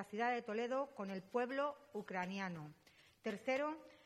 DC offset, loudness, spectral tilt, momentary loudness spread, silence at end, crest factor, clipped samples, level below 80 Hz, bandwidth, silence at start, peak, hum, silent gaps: under 0.1%; -42 LUFS; -5.5 dB/octave; 9 LU; 0.1 s; 18 dB; under 0.1%; -86 dBFS; 14 kHz; 0 s; -26 dBFS; none; none